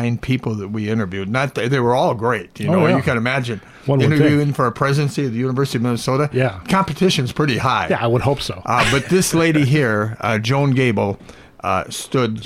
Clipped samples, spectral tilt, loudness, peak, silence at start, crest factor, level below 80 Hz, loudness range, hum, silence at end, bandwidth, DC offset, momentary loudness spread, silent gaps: under 0.1%; -5.5 dB/octave; -18 LUFS; -2 dBFS; 0 s; 16 dB; -44 dBFS; 2 LU; none; 0 s; 15.5 kHz; under 0.1%; 7 LU; none